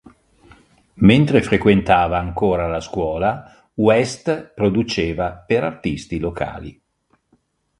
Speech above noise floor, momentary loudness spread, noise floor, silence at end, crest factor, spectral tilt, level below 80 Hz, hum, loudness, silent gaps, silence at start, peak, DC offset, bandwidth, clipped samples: 47 dB; 12 LU; -64 dBFS; 1.1 s; 20 dB; -6.5 dB/octave; -40 dBFS; none; -18 LUFS; none; 0.95 s; 0 dBFS; under 0.1%; 11.5 kHz; under 0.1%